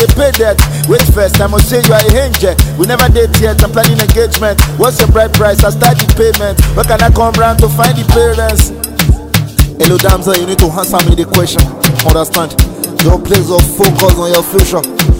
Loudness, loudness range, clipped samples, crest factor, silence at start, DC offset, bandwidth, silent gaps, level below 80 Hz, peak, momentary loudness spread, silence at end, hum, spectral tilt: -9 LUFS; 2 LU; 2%; 8 dB; 0 s; under 0.1%; over 20 kHz; none; -14 dBFS; 0 dBFS; 4 LU; 0 s; none; -5 dB/octave